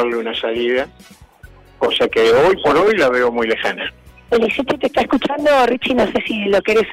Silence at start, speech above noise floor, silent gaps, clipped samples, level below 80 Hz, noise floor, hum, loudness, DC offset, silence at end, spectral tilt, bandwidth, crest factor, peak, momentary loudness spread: 0 s; 27 dB; none; under 0.1%; -46 dBFS; -43 dBFS; none; -16 LUFS; under 0.1%; 0 s; -4.5 dB/octave; 15.5 kHz; 10 dB; -6 dBFS; 8 LU